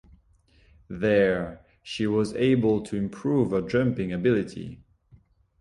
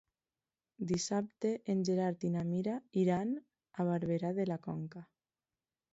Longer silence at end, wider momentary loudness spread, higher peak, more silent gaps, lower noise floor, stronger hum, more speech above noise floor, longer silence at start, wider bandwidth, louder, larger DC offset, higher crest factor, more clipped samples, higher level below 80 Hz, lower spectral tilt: about the same, 0.85 s vs 0.9 s; first, 15 LU vs 11 LU; first, -10 dBFS vs -20 dBFS; neither; second, -60 dBFS vs under -90 dBFS; neither; second, 36 dB vs over 55 dB; about the same, 0.9 s vs 0.8 s; first, 11.5 kHz vs 7.6 kHz; first, -25 LUFS vs -36 LUFS; neither; about the same, 16 dB vs 16 dB; neither; first, -52 dBFS vs -72 dBFS; about the same, -7.5 dB/octave vs -7.5 dB/octave